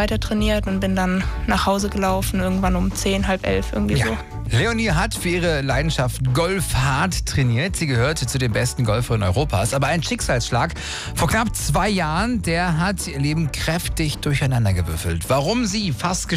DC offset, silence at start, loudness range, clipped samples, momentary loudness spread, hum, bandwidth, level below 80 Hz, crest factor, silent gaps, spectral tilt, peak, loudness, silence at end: under 0.1%; 0 s; 1 LU; under 0.1%; 3 LU; none; 16 kHz; -30 dBFS; 12 dB; none; -5 dB/octave; -8 dBFS; -21 LUFS; 0 s